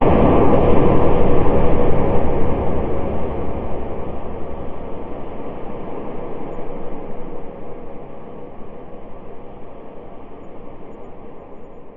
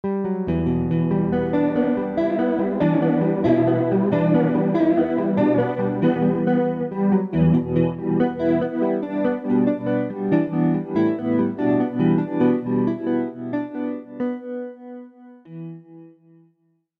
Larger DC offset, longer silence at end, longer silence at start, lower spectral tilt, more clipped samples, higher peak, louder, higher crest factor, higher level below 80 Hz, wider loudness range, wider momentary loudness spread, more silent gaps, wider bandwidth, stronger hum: first, 4% vs under 0.1%; second, 0 s vs 0.9 s; about the same, 0 s vs 0.05 s; about the same, -11 dB/octave vs -10.5 dB/octave; neither; first, 0 dBFS vs -6 dBFS; about the same, -21 LUFS vs -21 LUFS; about the same, 16 dB vs 14 dB; first, -26 dBFS vs -50 dBFS; first, 19 LU vs 7 LU; first, 23 LU vs 9 LU; neither; second, 3.5 kHz vs 4.9 kHz; neither